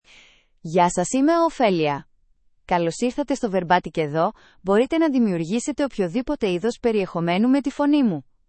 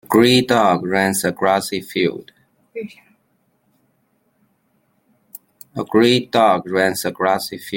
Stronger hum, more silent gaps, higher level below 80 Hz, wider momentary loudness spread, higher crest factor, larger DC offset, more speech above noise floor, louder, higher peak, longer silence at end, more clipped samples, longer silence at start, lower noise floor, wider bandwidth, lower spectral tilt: neither; neither; first, -52 dBFS vs -58 dBFS; second, 6 LU vs 19 LU; about the same, 18 dB vs 18 dB; neither; second, 39 dB vs 47 dB; second, -22 LUFS vs -17 LUFS; second, -4 dBFS vs 0 dBFS; first, 0.25 s vs 0 s; neither; first, 0.65 s vs 0.1 s; second, -60 dBFS vs -64 dBFS; second, 8.8 kHz vs 17 kHz; about the same, -5.5 dB/octave vs -4.5 dB/octave